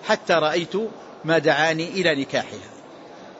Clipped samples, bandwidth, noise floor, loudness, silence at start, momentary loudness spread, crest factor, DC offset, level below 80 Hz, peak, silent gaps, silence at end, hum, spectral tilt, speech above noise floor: under 0.1%; 8 kHz; -42 dBFS; -21 LUFS; 0 s; 20 LU; 18 dB; under 0.1%; -66 dBFS; -6 dBFS; none; 0 s; none; -4.5 dB/octave; 20 dB